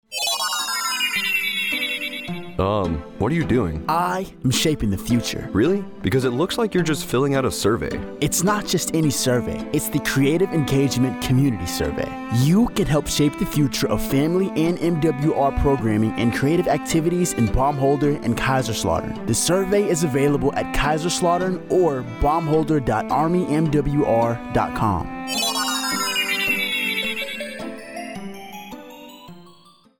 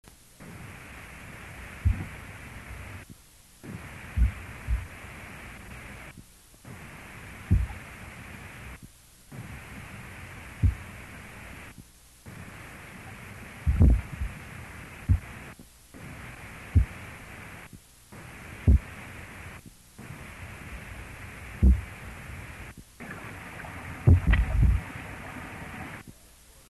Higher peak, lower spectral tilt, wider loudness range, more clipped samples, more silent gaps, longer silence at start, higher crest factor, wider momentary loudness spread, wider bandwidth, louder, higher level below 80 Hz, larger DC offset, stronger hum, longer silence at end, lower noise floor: about the same, -8 dBFS vs -8 dBFS; second, -4.5 dB/octave vs -7 dB/octave; second, 2 LU vs 8 LU; neither; neither; second, 0.1 s vs 0.4 s; second, 14 dB vs 22 dB; second, 6 LU vs 22 LU; first, 19.5 kHz vs 12.5 kHz; first, -21 LUFS vs -31 LUFS; about the same, -38 dBFS vs -34 dBFS; neither; neither; about the same, 0.5 s vs 0.6 s; about the same, -51 dBFS vs -54 dBFS